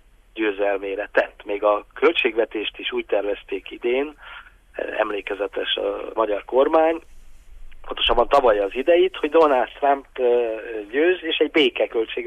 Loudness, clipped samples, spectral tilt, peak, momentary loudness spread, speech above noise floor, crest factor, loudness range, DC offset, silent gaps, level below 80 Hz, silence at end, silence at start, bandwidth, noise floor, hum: -21 LUFS; under 0.1%; -4.5 dB/octave; -6 dBFS; 12 LU; 20 dB; 16 dB; 6 LU; under 0.1%; none; -44 dBFS; 0 s; 0.35 s; 9 kHz; -41 dBFS; none